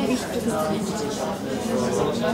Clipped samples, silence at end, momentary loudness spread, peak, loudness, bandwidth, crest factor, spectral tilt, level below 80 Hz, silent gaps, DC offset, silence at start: under 0.1%; 0 s; 4 LU; -10 dBFS; -25 LUFS; 16 kHz; 14 dB; -5 dB/octave; -50 dBFS; none; under 0.1%; 0 s